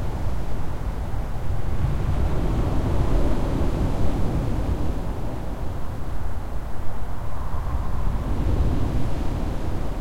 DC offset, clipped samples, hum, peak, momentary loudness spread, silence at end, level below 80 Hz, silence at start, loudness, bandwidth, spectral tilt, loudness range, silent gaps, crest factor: under 0.1%; under 0.1%; none; -8 dBFS; 8 LU; 0 s; -26 dBFS; 0 s; -28 LUFS; 15 kHz; -7.5 dB/octave; 6 LU; none; 12 dB